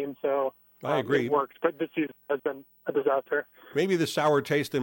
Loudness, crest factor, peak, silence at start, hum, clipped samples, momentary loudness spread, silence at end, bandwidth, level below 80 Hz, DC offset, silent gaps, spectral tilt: -28 LUFS; 18 dB; -10 dBFS; 0 s; none; under 0.1%; 8 LU; 0 s; 17 kHz; -74 dBFS; under 0.1%; none; -5.5 dB/octave